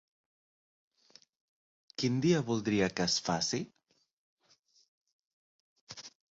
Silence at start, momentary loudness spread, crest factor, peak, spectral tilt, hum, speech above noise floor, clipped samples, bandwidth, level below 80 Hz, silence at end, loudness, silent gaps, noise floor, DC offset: 2 s; 19 LU; 20 dB; -16 dBFS; -4.5 dB/octave; none; 39 dB; under 0.1%; 8 kHz; -68 dBFS; 0.3 s; -31 LUFS; 4.13-4.37 s, 4.59-4.63 s, 4.88-5.01 s, 5.13-5.19 s, 5.27-5.87 s; -69 dBFS; under 0.1%